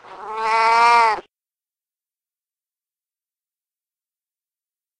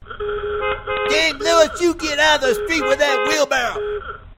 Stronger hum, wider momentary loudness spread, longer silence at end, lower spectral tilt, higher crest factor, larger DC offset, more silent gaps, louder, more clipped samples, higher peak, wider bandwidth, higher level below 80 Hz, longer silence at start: neither; first, 14 LU vs 10 LU; first, 3.8 s vs 0.05 s; about the same, -1 dB/octave vs -2 dB/octave; about the same, 20 dB vs 18 dB; neither; neither; about the same, -16 LUFS vs -18 LUFS; neither; about the same, -2 dBFS vs 0 dBFS; second, 10.5 kHz vs 16.5 kHz; second, -64 dBFS vs -40 dBFS; about the same, 0.1 s vs 0 s